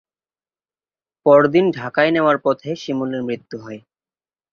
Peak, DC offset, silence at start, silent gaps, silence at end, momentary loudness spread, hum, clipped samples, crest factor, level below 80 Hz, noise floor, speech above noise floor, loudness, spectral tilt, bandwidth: -2 dBFS; under 0.1%; 1.25 s; none; 0.75 s; 20 LU; none; under 0.1%; 18 dB; -64 dBFS; under -90 dBFS; over 73 dB; -17 LUFS; -7 dB/octave; 7 kHz